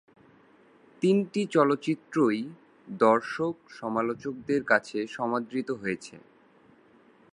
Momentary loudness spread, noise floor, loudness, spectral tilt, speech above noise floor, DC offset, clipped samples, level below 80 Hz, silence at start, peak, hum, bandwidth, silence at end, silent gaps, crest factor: 11 LU; -59 dBFS; -28 LUFS; -6.5 dB/octave; 32 dB; under 0.1%; under 0.1%; -72 dBFS; 1 s; -6 dBFS; none; 11 kHz; 1.15 s; none; 22 dB